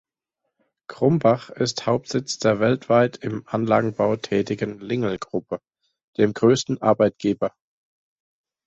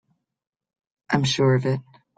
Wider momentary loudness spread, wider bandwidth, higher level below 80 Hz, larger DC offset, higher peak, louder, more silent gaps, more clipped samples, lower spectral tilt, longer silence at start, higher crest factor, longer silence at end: about the same, 10 LU vs 8 LU; second, 8.2 kHz vs 9.2 kHz; about the same, -60 dBFS vs -58 dBFS; neither; about the same, -4 dBFS vs -4 dBFS; about the same, -22 LUFS vs -22 LUFS; first, 6.04-6.13 s vs none; neither; about the same, -6 dB/octave vs -5.5 dB/octave; second, 0.9 s vs 1.1 s; about the same, 20 dB vs 20 dB; first, 1.2 s vs 0.35 s